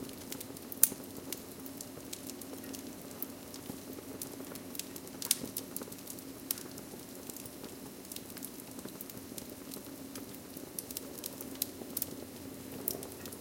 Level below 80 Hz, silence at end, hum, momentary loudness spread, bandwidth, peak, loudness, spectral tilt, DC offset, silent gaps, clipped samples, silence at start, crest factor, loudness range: -70 dBFS; 0 s; none; 13 LU; 17 kHz; -4 dBFS; -39 LUFS; -2.5 dB/octave; under 0.1%; none; under 0.1%; 0 s; 38 dB; 8 LU